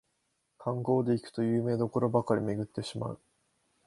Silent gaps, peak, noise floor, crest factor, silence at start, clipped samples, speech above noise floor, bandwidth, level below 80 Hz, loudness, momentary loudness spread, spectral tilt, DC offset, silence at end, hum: none; -12 dBFS; -78 dBFS; 20 dB; 0.6 s; under 0.1%; 48 dB; 11.5 kHz; -66 dBFS; -31 LUFS; 11 LU; -8 dB/octave; under 0.1%; 0.7 s; none